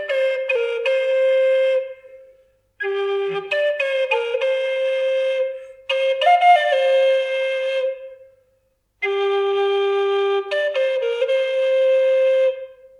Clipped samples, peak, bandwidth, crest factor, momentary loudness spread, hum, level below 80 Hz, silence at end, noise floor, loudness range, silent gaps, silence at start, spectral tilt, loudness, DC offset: under 0.1%; -4 dBFS; 10 kHz; 16 dB; 8 LU; 50 Hz at -70 dBFS; -72 dBFS; 0.25 s; -65 dBFS; 4 LU; none; 0 s; -2.5 dB/octave; -19 LUFS; under 0.1%